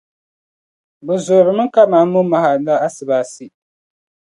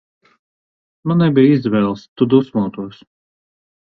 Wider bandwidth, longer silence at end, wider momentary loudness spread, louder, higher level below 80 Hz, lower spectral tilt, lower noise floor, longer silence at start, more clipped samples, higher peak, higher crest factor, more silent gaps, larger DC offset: first, 11.5 kHz vs 6 kHz; about the same, 0.85 s vs 0.95 s; second, 10 LU vs 15 LU; about the same, -14 LUFS vs -15 LUFS; second, -68 dBFS vs -56 dBFS; second, -6.5 dB/octave vs -9.5 dB/octave; about the same, under -90 dBFS vs under -90 dBFS; about the same, 1.05 s vs 1.05 s; neither; about the same, 0 dBFS vs 0 dBFS; about the same, 16 dB vs 18 dB; second, none vs 2.08-2.16 s; neither